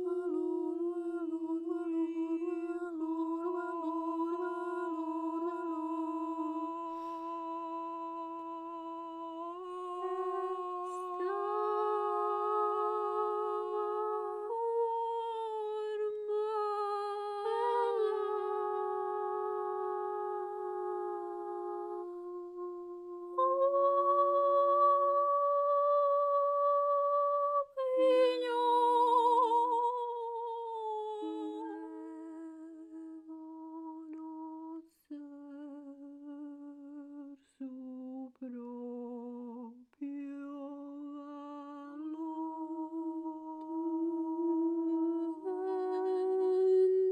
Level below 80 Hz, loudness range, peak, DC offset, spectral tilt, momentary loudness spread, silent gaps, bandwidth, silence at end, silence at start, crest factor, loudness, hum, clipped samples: -86 dBFS; 17 LU; -18 dBFS; under 0.1%; -4.5 dB/octave; 18 LU; none; 11.5 kHz; 0 s; 0 s; 16 dB; -34 LUFS; none; under 0.1%